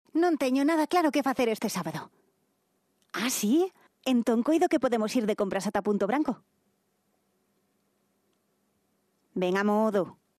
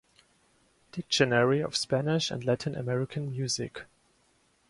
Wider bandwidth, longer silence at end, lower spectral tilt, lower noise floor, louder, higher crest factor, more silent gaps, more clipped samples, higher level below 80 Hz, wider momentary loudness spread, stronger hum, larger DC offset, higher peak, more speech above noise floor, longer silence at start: first, 14 kHz vs 11.5 kHz; second, 0.25 s vs 0.85 s; about the same, -5 dB/octave vs -4.5 dB/octave; first, -74 dBFS vs -68 dBFS; about the same, -27 LUFS vs -29 LUFS; second, 16 dB vs 22 dB; neither; neither; second, -70 dBFS vs -64 dBFS; second, 9 LU vs 15 LU; neither; neither; about the same, -12 dBFS vs -10 dBFS; first, 47 dB vs 39 dB; second, 0.15 s vs 0.95 s